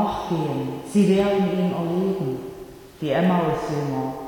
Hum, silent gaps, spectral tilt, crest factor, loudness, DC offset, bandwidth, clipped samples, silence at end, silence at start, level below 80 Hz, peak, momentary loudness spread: none; none; -7.5 dB/octave; 14 dB; -23 LUFS; under 0.1%; 18.5 kHz; under 0.1%; 0 s; 0 s; -50 dBFS; -8 dBFS; 13 LU